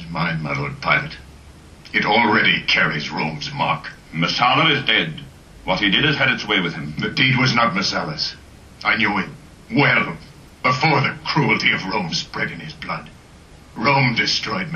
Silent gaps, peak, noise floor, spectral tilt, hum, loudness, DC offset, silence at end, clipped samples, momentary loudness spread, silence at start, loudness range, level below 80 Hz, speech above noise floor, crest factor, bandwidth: none; -2 dBFS; -44 dBFS; -4.5 dB/octave; none; -18 LUFS; under 0.1%; 0 s; under 0.1%; 12 LU; 0 s; 3 LU; -48 dBFS; 25 dB; 18 dB; 11.5 kHz